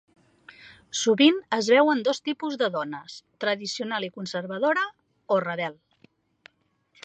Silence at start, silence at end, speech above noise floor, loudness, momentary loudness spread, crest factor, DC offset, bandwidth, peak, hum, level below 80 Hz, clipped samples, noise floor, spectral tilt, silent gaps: 0.6 s; 1.3 s; 43 dB; -25 LUFS; 13 LU; 20 dB; under 0.1%; 9 kHz; -6 dBFS; none; -76 dBFS; under 0.1%; -68 dBFS; -3.5 dB/octave; none